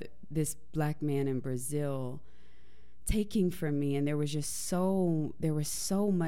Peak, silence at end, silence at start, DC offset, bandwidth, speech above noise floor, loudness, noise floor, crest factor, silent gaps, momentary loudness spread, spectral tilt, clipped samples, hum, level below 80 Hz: -16 dBFS; 0 s; 0 s; 1%; 16.5 kHz; 30 dB; -33 LUFS; -62 dBFS; 16 dB; none; 6 LU; -6 dB/octave; under 0.1%; none; -48 dBFS